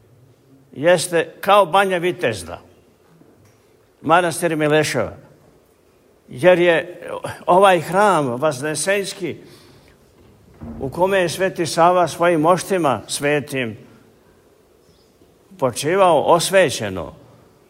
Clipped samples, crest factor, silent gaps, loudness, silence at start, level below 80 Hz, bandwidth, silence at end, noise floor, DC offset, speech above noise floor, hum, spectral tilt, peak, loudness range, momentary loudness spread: under 0.1%; 18 dB; none; -17 LUFS; 0.75 s; -54 dBFS; 16 kHz; 0.6 s; -55 dBFS; under 0.1%; 37 dB; none; -4.5 dB/octave; -2 dBFS; 5 LU; 16 LU